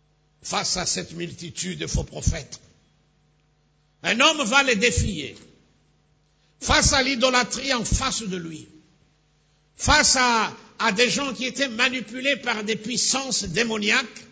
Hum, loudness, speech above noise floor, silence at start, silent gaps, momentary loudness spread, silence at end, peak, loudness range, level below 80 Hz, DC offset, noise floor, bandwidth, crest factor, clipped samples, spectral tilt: none; -21 LUFS; 41 dB; 0.45 s; none; 15 LU; 0.05 s; -4 dBFS; 7 LU; -38 dBFS; under 0.1%; -64 dBFS; 8 kHz; 22 dB; under 0.1%; -2.5 dB/octave